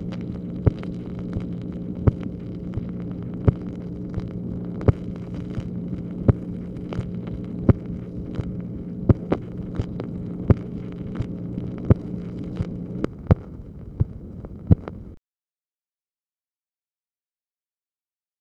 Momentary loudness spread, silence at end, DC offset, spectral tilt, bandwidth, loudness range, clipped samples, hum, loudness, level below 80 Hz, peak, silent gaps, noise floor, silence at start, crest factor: 11 LU; 3.2 s; under 0.1%; -10.5 dB/octave; 5.8 kHz; 3 LU; under 0.1%; none; -27 LUFS; -36 dBFS; 0 dBFS; none; under -90 dBFS; 0 s; 26 dB